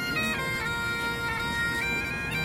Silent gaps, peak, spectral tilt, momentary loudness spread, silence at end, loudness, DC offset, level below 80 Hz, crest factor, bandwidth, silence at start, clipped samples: none; -18 dBFS; -3.5 dB/octave; 2 LU; 0 s; -28 LUFS; under 0.1%; -46 dBFS; 12 dB; 16.5 kHz; 0 s; under 0.1%